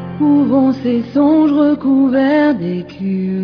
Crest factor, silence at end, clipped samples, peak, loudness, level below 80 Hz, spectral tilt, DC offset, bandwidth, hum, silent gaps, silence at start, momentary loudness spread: 10 dB; 0 s; under 0.1%; -2 dBFS; -14 LUFS; -52 dBFS; -9.5 dB/octave; under 0.1%; 5.4 kHz; none; none; 0 s; 8 LU